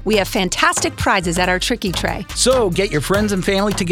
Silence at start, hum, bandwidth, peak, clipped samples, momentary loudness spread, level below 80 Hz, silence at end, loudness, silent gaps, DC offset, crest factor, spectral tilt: 0 s; none; 18 kHz; 0 dBFS; under 0.1%; 4 LU; -32 dBFS; 0 s; -17 LUFS; none; under 0.1%; 18 dB; -3.5 dB/octave